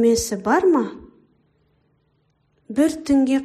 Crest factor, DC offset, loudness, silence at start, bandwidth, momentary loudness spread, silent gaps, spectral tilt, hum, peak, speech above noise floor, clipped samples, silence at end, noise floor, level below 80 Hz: 16 dB; under 0.1%; -20 LUFS; 0 s; 15 kHz; 8 LU; none; -4.5 dB/octave; none; -6 dBFS; 47 dB; under 0.1%; 0 s; -65 dBFS; -50 dBFS